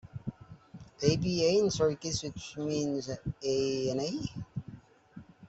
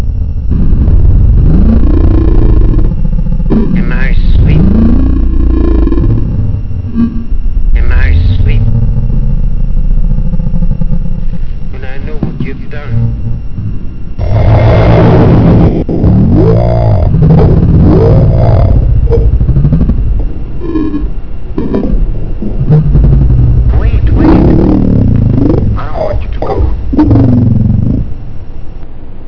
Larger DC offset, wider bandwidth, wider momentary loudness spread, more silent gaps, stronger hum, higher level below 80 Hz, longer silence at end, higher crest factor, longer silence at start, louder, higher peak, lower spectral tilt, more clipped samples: second, under 0.1% vs 4%; first, 8.2 kHz vs 5.4 kHz; first, 17 LU vs 13 LU; neither; neither; second, -58 dBFS vs -10 dBFS; about the same, 0 s vs 0 s; first, 22 dB vs 6 dB; about the same, 0.05 s vs 0 s; second, -31 LUFS vs -9 LUFS; second, -12 dBFS vs 0 dBFS; second, -5 dB/octave vs -11 dB/octave; second, under 0.1% vs 4%